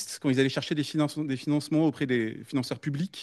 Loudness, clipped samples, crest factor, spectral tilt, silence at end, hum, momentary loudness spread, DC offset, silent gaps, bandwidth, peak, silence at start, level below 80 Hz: -28 LUFS; under 0.1%; 16 dB; -5.5 dB/octave; 0 s; none; 6 LU; under 0.1%; none; 12.5 kHz; -10 dBFS; 0 s; -72 dBFS